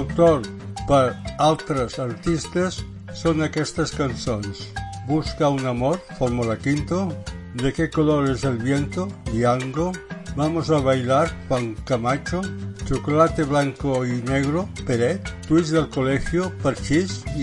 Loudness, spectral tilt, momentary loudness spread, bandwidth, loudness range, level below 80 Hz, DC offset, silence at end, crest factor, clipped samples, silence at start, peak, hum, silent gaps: -23 LUFS; -6 dB/octave; 9 LU; 11.5 kHz; 3 LU; -40 dBFS; under 0.1%; 0 s; 18 dB; under 0.1%; 0 s; -4 dBFS; none; none